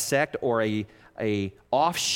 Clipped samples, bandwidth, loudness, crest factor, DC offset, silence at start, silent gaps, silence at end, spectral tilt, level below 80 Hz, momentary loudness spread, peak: under 0.1%; 17 kHz; -27 LUFS; 16 dB; under 0.1%; 0 s; none; 0 s; -3.5 dB/octave; -62 dBFS; 8 LU; -10 dBFS